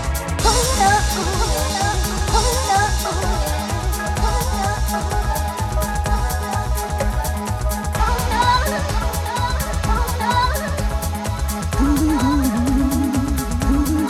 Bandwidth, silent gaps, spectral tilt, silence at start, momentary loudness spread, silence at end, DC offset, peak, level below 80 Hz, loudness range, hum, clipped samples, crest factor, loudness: 17 kHz; none; -4.5 dB/octave; 0 s; 6 LU; 0 s; under 0.1%; -2 dBFS; -24 dBFS; 3 LU; none; under 0.1%; 16 dB; -20 LUFS